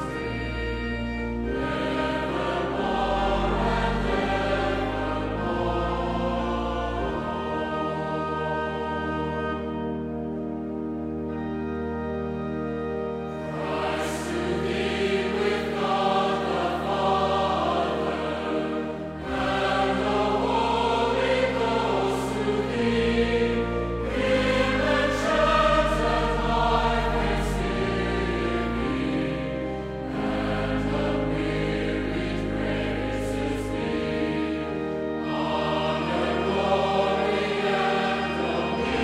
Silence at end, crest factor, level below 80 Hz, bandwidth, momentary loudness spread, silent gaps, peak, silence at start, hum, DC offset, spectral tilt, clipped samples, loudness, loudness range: 0 s; 16 dB; -38 dBFS; 14 kHz; 7 LU; none; -8 dBFS; 0 s; none; under 0.1%; -6 dB/octave; under 0.1%; -26 LUFS; 6 LU